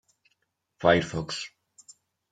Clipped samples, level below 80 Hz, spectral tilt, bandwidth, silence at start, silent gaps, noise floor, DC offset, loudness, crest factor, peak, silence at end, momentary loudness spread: under 0.1%; -60 dBFS; -5 dB/octave; 9.4 kHz; 0.8 s; none; -76 dBFS; under 0.1%; -26 LUFS; 24 dB; -6 dBFS; 0.85 s; 13 LU